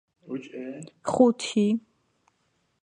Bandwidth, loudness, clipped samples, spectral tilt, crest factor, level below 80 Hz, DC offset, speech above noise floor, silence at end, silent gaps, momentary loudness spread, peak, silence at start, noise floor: 10 kHz; -25 LUFS; under 0.1%; -5.5 dB/octave; 22 dB; -68 dBFS; under 0.1%; 47 dB; 1.05 s; none; 17 LU; -6 dBFS; 0.25 s; -72 dBFS